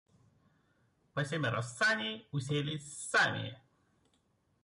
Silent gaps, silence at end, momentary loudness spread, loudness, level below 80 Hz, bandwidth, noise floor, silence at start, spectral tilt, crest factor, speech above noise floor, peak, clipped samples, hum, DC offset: none; 1.05 s; 11 LU; -34 LUFS; -72 dBFS; 11.5 kHz; -75 dBFS; 1.15 s; -4 dB/octave; 18 dB; 41 dB; -20 dBFS; under 0.1%; none; under 0.1%